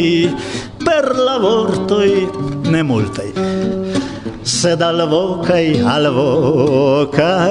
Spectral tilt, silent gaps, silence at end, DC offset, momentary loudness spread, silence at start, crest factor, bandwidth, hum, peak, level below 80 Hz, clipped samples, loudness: -5.5 dB/octave; none; 0 s; under 0.1%; 7 LU; 0 s; 14 dB; 11 kHz; none; 0 dBFS; -44 dBFS; under 0.1%; -15 LUFS